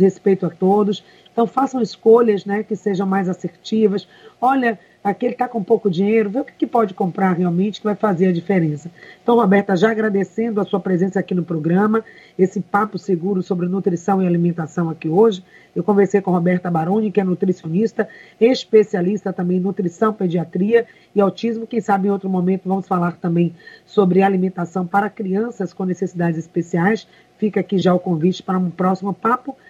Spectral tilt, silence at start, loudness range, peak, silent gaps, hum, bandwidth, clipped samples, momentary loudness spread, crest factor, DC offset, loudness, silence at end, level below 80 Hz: -8 dB/octave; 0 s; 2 LU; -2 dBFS; none; none; 7.8 kHz; under 0.1%; 7 LU; 16 dB; under 0.1%; -19 LUFS; 0.15 s; -66 dBFS